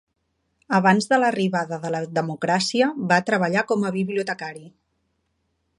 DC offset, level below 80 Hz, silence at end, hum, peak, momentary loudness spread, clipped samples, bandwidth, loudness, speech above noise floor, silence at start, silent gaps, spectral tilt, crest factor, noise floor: under 0.1%; -68 dBFS; 1.1 s; none; -2 dBFS; 9 LU; under 0.1%; 11.5 kHz; -22 LUFS; 50 dB; 0.7 s; none; -5 dB/octave; 20 dB; -72 dBFS